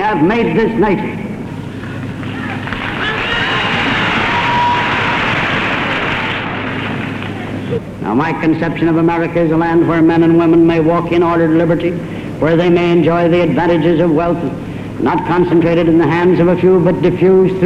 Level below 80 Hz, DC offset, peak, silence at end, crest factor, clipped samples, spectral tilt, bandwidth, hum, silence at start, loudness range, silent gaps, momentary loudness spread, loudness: -38 dBFS; under 0.1%; -2 dBFS; 0 s; 12 dB; under 0.1%; -7.5 dB/octave; 9 kHz; none; 0 s; 5 LU; none; 12 LU; -13 LUFS